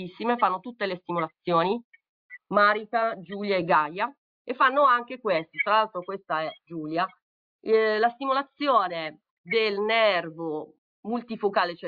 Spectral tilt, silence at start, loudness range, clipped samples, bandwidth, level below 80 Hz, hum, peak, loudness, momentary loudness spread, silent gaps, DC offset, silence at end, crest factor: -7.5 dB/octave; 0 s; 2 LU; under 0.1%; 5 kHz; -76 dBFS; none; -8 dBFS; -25 LUFS; 12 LU; 1.84-1.92 s, 2.09-2.29 s, 4.18-4.45 s, 7.22-7.59 s, 9.30-9.44 s, 10.78-11.03 s; under 0.1%; 0 s; 18 dB